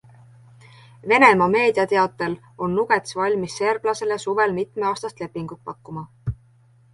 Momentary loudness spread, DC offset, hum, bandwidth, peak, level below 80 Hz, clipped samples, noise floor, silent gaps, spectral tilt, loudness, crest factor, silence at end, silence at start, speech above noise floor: 20 LU; under 0.1%; none; 11.5 kHz; -2 dBFS; -52 dBFS; under 0.1%; -55 dBFS; none; -5 dB/octave; -20 LUFS; 20 dB; 0.6 s; 1.05 s; 34 dB